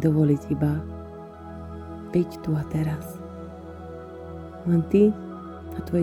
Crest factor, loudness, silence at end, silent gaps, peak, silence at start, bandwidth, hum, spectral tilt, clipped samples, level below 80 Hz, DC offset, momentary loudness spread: 18 dB; -25 LUFS; 0 s; none; -8 dBFS; 0 s; 14 kHz; none; -9.5 dB/octave; under 0.1%; -46 dBFS; under 0.1%; 19 LU